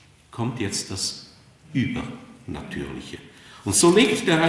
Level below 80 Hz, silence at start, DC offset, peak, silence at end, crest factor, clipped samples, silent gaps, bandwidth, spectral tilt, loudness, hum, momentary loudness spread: -54 dBFS; 0.35 s; under 0.1%; -4 dBFS; 0 s; 20 dB; under 0.1%; none; 12 kHz; -4 dB/octave; -23 LUFS; none; 23 LU